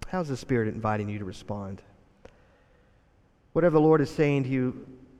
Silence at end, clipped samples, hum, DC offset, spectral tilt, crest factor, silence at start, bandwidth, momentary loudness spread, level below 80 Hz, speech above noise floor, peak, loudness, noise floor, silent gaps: 0.2 s; under 0.1%; none; under 0.1%; -8 dB/octave; 18 dB; 0 s; 12 kHz; 16 LU; -54 dBFS; 36 dB; -10 dBFS; -26 LUFS; -62 dBFS; none